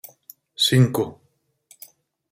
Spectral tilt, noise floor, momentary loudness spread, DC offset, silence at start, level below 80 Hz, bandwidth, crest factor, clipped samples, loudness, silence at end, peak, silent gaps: -5 dB/octave; -58 dBFS; 24 LU; under 0.1%; 0.6 s; -60 dBFS; 16 kHz; 20 dB; under 0.1%; -20 LUFS; 1.2 s; -4 dBFS; none